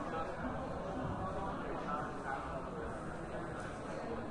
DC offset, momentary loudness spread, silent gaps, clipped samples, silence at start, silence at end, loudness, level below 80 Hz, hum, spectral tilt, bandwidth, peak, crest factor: under 0.1%; 3 LU; none; under 0.1%; 0 s; 0 s; -42 LUFS; -54 dBFS; none; -6.5 dB/octave; 11.5 kHz; -28 dBFS; 14 dB